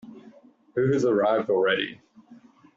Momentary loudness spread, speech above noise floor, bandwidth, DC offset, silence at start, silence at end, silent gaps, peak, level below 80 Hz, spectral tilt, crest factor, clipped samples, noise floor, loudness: 9 LU; 30 dB; 7.8 kHz; under 0.1%; 0.05 s; 0.4 s; none; -10 dBFS; -68 dBFS; -4 dB/octave; 16 dB; under 0.1%; -53 dBFS; -24 LUFS